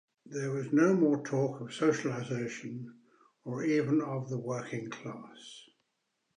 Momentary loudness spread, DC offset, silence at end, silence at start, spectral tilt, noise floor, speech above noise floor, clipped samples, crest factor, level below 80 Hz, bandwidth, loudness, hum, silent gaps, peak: 21 LU; under 0.1%; 0.75 s; 0.25 s; -6.5 dB/octave; -81 dBFS; 49 dB; under 0.1%; 18 dB; -82 dBFS; 10 kHz; -32 LUFS; none; none; -14 dBFS